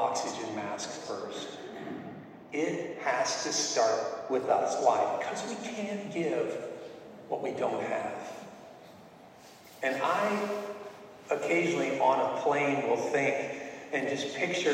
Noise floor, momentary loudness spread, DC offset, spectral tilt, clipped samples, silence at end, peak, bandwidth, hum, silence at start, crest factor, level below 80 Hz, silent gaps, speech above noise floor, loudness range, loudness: -53 dBFS; 17 LU; under 0.1%; -3.5 dB/octave; under 0.1%; 0 s; -10 dBFS; 16 kHz; none; 0 s; 20 dB; -78 dBFS; none; 23 dB; 6 LU; -31 LUFS